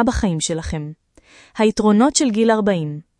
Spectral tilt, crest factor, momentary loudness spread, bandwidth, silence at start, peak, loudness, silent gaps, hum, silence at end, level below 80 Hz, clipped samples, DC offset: -5 dB/octave; 16 dB; 14 LU; 11 kHz; 0 s; -2 dBFS; -18 LUFS; none; none; 0.2 s; -36 dBFS; under 0.1%; under 0.1%